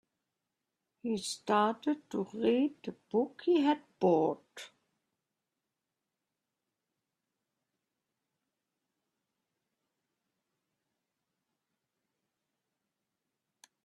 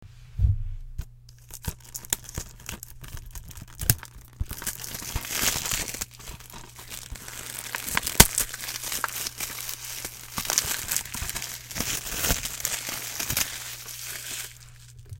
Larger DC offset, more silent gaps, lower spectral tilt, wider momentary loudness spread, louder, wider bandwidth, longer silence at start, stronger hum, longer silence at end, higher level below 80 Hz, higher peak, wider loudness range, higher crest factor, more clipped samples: neither; neither; first, -5.5 dB/octave vs -2 dB/octave; about the same, 16 LU vs 17 LU; second, -32 LUFS vs -27 LUFS; second, 13 kHz vs 17 kHz; first, 1.05 s vs 0 s; neither; first, 9.2 s vs 0 s; second, -82 dBFS vs -38 dBFS; second, -16 dBFS vs 0 dBFS; about the same, 6 LU vs 8 LU; second, 22 dB vs 30 dB; neither